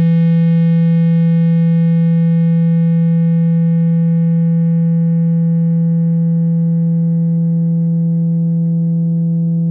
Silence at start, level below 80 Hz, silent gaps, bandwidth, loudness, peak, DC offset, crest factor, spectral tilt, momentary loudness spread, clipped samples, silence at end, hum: 0 s; -64 dBFS; none; 3.3 kHz; -13 LUFS; -6 dBFS; under 0.1%; 6 dB; -13.5 dB/octave; 3 LU; under 0.1%; 0 s; none